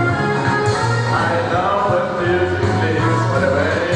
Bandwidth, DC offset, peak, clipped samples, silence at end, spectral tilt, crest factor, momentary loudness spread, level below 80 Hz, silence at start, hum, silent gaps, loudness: 10.5 kHz; under 0.1%; -4 dBFS; under 0.1%; 0 s; -6.5 dB/octave; 14 dB; 1 LU; -46 dBFS; 0 s; none; none; -17 LUFS